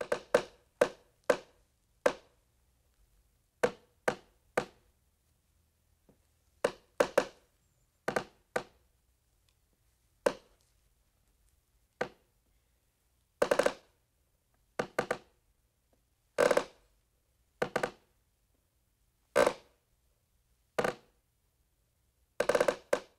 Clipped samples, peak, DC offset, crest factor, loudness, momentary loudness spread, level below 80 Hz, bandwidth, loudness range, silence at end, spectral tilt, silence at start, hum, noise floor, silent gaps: under 0.1%; -12 dBFS; under 0.1%; 26 dB; -34 LUFS; 14 LU; -68 dBFS; 16 kHz; 7 LU; 0.15 s; -3.5 dB/octave; 0 s; none; -75 dBFS; none